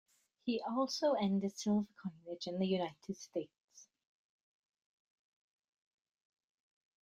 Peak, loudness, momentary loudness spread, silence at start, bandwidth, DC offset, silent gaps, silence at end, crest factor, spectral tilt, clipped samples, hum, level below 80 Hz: -22 dBFS; -38 LUFS; 12 LU; 0.45 s; 11.5 kHz; under 0.1%; 3.60-3.68 s; 3.2 s; 18 dB; -5.5 dB/octave; under 0.1%; none; -80 dBFS